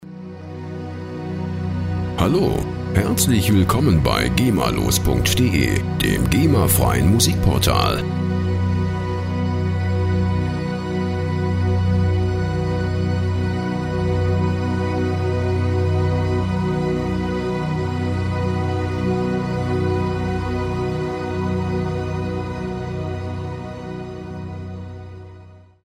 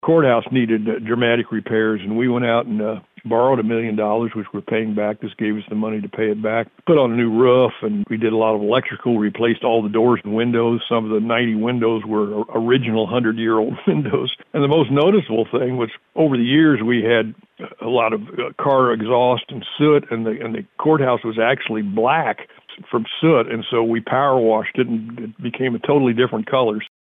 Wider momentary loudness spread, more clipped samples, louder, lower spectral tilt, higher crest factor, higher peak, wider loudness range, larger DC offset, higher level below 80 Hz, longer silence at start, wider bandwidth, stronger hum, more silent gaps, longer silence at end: first, 14 LU vs 9 LU; neither; about the same, -20 LUFS vs -18 LUFS; second, -5.5 dB/octave vs -9.5 dB/octave; about the same, 18 dB vs 14 dB; about the same, -2 dBFS vs -4 dBFS; first, 7 LU vs 3 LU; neither; first, -34 dBFS vs -64 dBFS; about the same, 0 s vs 0.05 s; first, 16 kHz vs 3.9 kHz; neither; neither; about the same, 0.3 s vs 0.2 s